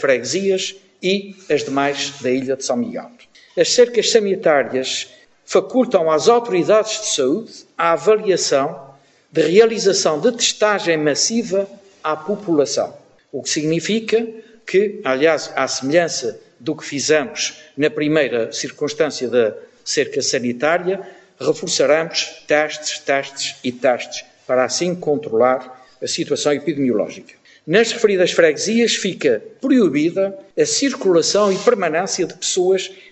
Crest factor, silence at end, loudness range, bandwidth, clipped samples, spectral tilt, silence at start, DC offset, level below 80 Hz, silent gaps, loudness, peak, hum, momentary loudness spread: 18 dB; 0.15 s; 4 LU; 8.6 kHz; under 0.1%; -3 dB/octave; 0 s; under 0.1%; -70 dBFS; none; -18 LUFS; 0 dBFS; none; 10 LU